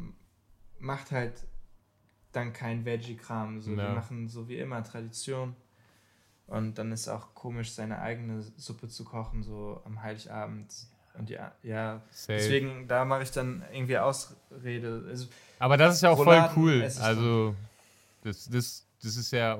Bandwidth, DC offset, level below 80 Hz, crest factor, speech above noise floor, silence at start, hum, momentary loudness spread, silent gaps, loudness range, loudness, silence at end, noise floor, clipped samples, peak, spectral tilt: 16.5 kHz; under 0.1%; -54 dBFS; 26 dB; 38 dB; 0 s; none; 20 LU; none; 16 LU; -29 LUFS; 0 s; -67 dBFS; under 0.1%; -4 dBFS; -5.5 dB/octave